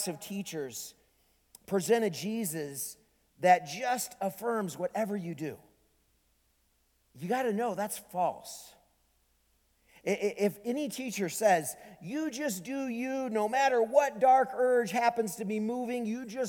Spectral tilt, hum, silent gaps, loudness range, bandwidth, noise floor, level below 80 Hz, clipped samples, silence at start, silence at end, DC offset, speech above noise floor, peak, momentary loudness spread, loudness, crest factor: -4.5 dB/octave; none; none; 8 LU; 19.5 kHz; -72 dBFS; -74 dBFS; under 0.1%; 0 s; 0 s; under 0.1%; 41 dB; -10 dBFS; 14 LU; -31 LUFS; 22 dB